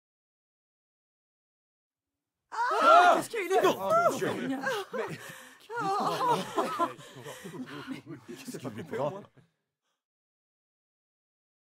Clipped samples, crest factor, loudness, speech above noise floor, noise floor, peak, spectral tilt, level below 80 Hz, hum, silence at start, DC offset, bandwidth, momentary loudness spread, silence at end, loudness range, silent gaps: under 0.1%; 24 dB; -27 LUFS; 58 dB; -90 dBFS; -8 dBFS; -4 dB/octave; -82 dBFS; none; 2.5 s; under 0.1%; 16 kHz; 22 LU; 2.45 s; 15 LU; none